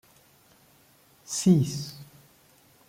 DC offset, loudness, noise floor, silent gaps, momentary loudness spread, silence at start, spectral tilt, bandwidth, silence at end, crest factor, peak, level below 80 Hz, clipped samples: under 0.1%; -25 LUFS; -60 dBFS; none; 19 LU; 1.3 s; -6 dB/octave; 16 kHz; 0.85 s; 20 dB; -10 dBFS; -66 dBFS; under 0.1%